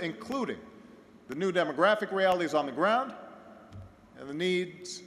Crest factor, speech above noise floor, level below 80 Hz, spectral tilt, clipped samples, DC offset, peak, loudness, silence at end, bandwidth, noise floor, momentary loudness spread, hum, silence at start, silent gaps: 20 dB; 24 dB; -68 dBFS; -5 dB/octave; under 0.1%; under 0.1%; -12 dBFS; -29 LUFS; 0 s; 13.5 kHz; -54 dBFS; 23 LU; none; 0 s; none